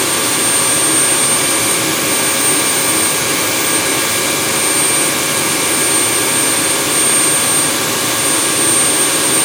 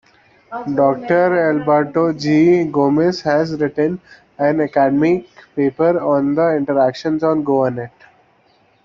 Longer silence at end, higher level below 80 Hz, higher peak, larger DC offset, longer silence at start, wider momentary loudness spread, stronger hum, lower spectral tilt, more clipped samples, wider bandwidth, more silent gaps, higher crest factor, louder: second, 0 s vs 0.95 s; first, -50 dBFS vs -56 dBFS; about the same, 0 dBFS vs -2 dBFS; neither; second, 0 s vs 0.5 s; second, 3 LU vs 7 LU; neither; second, -1 dB/octave vs -7.5 dB/octave; neither; first, 18 kHz vs 7.2 kHz; neither; about the same, 14 dB vs 14 dB; first, -11 LUFS vs -16 LUFS